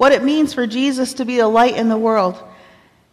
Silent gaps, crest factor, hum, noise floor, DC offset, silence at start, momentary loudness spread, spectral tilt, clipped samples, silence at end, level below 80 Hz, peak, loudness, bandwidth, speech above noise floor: none; 14 dB; none; -49 dBFS; under 0.1%; 0 s; 7 LU; -4.5 dB/octave; under 0.1%; 0.65 s; -54 dBFS; -4 dBFS; -16 LUFS; 14 kHz; 34 dB